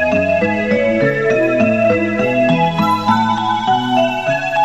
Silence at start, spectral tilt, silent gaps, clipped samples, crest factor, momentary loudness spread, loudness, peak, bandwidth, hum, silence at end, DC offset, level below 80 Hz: 0 s; -6.5 dB/octave; none; under 0.1%; 14 dB; 2 LU; -15 LUFS; -2 dBFS; 13.5 kHz; none; 0 s; 0.7%; -48 dBFS